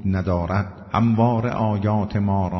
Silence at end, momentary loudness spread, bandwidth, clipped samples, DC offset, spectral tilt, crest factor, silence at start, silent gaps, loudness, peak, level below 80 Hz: 0 s; 6 LU; 6.2 kHz; under 0.1%; under 0.1%; -9.5 dB/octave; 14 dB; 0 s; none; -21 LUFS; -6 dBFS; -46 dBFS